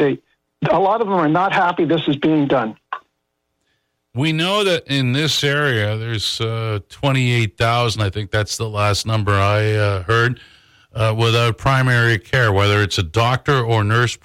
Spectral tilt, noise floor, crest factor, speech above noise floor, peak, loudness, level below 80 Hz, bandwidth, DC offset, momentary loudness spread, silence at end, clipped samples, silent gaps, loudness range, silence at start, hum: -5.5 dB/octave; -73 dBFS; 10 dB; 55 dB; -6 dBFS; -17 LUFS; -46 dBFS; 15.5 kHz; under 0.1%; 6 LU; 0.1 s; under 0.1%; none; 3 LU; 0 s; none